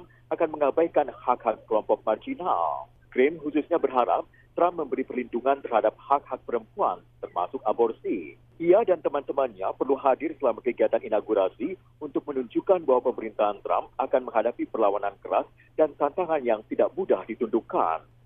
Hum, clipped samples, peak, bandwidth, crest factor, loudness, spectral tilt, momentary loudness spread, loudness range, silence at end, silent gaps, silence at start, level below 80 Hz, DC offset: none; under 0.1%; -6 dBFS; 3.8 kHz; 20 dB; -26 LUFS; -9 dB/octave; 8 LU; 2 LU; 0.25 s; none; 0 s; -62 dBFS; under 0.1%